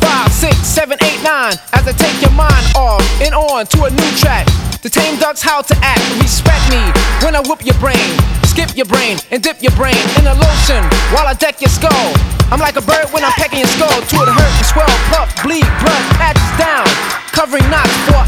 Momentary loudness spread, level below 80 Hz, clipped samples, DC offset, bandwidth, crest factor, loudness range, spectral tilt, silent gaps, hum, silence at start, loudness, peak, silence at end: 3 LU; -16 dBFS; under 0.1%; under 0.1%; 17.5 kHz; 10 dB; 1 LU; -4 dB/octave; none; none; 0 s; -11 LUFS; 0 dBFS; 0 s